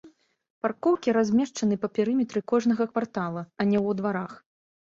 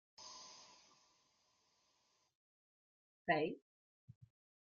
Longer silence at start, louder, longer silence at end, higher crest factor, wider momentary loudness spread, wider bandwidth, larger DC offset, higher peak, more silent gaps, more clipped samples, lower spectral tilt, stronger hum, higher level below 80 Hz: second, 0.05 s vs 0.2 s; first, -26 LUFS vs -41 LUFS; second, 0.6 s vs 1.05 s; second, 16 dB vs 26 dB; second, 8 LU vs 21 LU; about the same, 7.6 kHz vs 7.4 kHz; neither; first, -10 dBFS vs -22 dBFS; second, 0.50-0.61 s vs 2.35-3.25 s; neither; first, -6.5 dB/octave vs -3 dB/octave; neither; first, -66 dBFS vs -84 dBFS